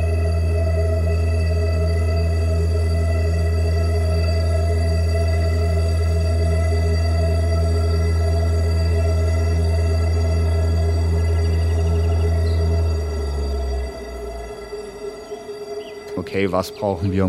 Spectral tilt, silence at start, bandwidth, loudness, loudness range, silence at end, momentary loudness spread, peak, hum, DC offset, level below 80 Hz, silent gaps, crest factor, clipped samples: -7 dB/octave; 0 s; 11 kHz; -20 LUFS; 7 LU; 0 s; 12 LU; -4 dBFS; none; under 0.1%; -24 dBFS; none; 14 dB; under 0.1%